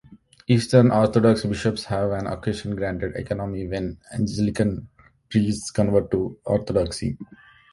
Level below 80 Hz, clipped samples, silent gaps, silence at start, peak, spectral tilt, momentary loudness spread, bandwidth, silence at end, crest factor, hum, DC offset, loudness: -44 dBFS; under 0.1%; none; 0.1 s; -2 dBFS; -6.5 dB/octave; 12 LU; 11.5 kHz; 0.5 s; 20 dB; none; under 0.1%; -23 LUFS